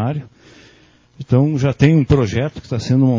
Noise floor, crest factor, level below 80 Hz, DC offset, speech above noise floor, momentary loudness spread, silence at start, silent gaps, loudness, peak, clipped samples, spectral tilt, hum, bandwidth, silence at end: -50 dBFS; 16 dB; -36 dBFS; under 0.1%; 35 dB; 11 LU; 0 s; none; -16 LUFS; 0 dBFS; under 0.1%; -8 dB/octave; none; 7.6 kHz; 0 s